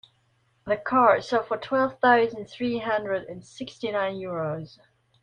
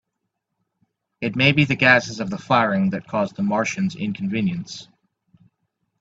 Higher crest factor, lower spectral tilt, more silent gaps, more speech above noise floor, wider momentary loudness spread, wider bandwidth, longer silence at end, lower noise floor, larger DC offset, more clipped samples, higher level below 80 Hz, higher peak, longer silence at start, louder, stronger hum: about the same, 20 dB vs 22 dB; about the same, -6 dB/octave vs -5.5 dB/octave; neither; second, 42 dB vs 58 dB; first, 18 LU vs 14 LU; first, 9.8 kHz vs 7.8 kHz; second, 0.55 s vs 1.15 s; second, -67 dBFS vs -78 dBFS; neither; neither; second, -64 dBFS vs -56 dBFS; second, -6 dBFS vs 0 dBFS; second, 0.65 s vs 1.2 s; second, -25 LUFS vs -20 LUFS; neither